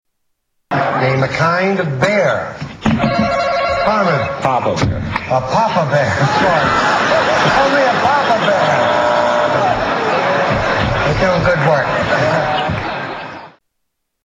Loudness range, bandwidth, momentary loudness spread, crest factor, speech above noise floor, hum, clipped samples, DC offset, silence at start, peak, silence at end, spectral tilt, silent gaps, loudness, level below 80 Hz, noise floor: 3 LU; 9.8 kHz; 6 LU; 12 dB; 57 dB; none; under 0.1%; under 0.1%; 0.7 s; -2 dBFS; 0.75 s; -5.5 dB/octave; none; -14 LUFS; -36 dBFS; -71 dBFS